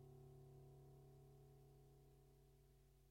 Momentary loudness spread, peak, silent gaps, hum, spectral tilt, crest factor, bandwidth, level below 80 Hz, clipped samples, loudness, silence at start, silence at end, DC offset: 4 LU; -54 dBFS; none; none; -7.5 dB/octave; 14 dB; 16 kHz; -74 dBFS; under 0.1%; -67 LUFS; 0 s; 0 s; under 0.1%